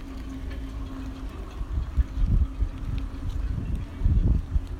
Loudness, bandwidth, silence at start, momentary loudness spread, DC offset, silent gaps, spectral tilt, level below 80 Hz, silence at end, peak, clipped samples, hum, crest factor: -30 LUFS; 7.2 kHz; 0 s; 12 LU; under 0.1%; none; -8 dB/octave; -28 dBFS; 0 s; -12 dBFS; under 0.1%; none; 16 dB